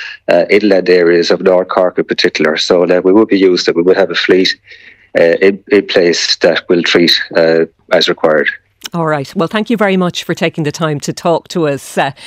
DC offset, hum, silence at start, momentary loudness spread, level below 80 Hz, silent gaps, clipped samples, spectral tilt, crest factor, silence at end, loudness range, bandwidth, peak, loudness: under 0.1%; none; 0 s; 7 LU; -56 dBFS; none; 0.2%; -4.5 dB/octave; 12 dB; 0 s; 4 LU; 15.5 kHz; 0 dBFS; -11 LUFS